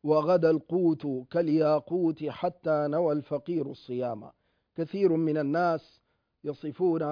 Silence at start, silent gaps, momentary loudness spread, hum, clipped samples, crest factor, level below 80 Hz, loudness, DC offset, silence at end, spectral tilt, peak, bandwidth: 0.05 s; none; 12 LU; none; under 0.1%; 16 dB; -72 dBFS; -28 LUFS; under 0.1%; 0 s; -9.5 dB/octave; -12 dBFS; 5.2 kHz